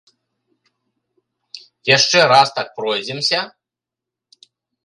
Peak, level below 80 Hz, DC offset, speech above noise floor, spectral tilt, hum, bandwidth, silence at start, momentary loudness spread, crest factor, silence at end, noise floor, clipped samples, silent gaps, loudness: 0 dBFS; -70 dBFS; under 0.1%; 70 dB; -2 dB/octave; none; 11.5 kHz; 1.55 s; 25 LU; 20 dB; 1.4 s; -86 dBFS; under 0.1%; none; -15 LUFS